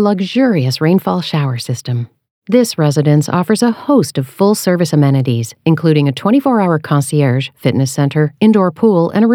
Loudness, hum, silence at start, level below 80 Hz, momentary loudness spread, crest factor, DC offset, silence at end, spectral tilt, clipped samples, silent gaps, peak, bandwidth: -13 LUFS; none; 0 s; -66 dBFS; 6 LU; 12 dB; under 0.1%; 0 s; -6.5 dB/octave; under 0.1%; 2.31-2.42 s; 0 dBFS; 17 kHz